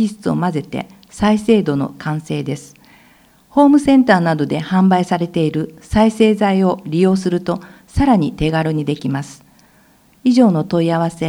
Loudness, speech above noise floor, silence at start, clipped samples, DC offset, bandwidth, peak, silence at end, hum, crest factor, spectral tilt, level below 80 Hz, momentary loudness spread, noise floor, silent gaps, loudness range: -16 LUFS; 36 dB; 0 s; under 0.1%; under 0.1%; 12 kHz; 0 dBFS; 0 s; none; 16 dB; -7 dB/octave; -38 dBFS; 12 LU; -51 dBFS; none; 5 LU